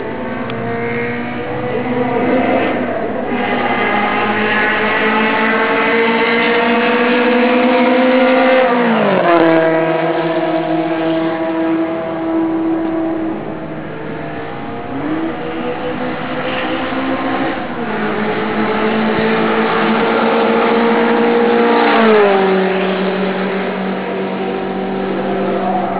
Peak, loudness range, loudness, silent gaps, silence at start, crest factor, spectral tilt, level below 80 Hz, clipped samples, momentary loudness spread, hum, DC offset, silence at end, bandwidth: 0 dBFS; 8 LU; -15 LUFS; none; 0 s; 14 dB; -9.5 dB/octave; -48 dBFS; under 0.1%; 10 LU; none; under 0.1%; 0 s; 4 kHz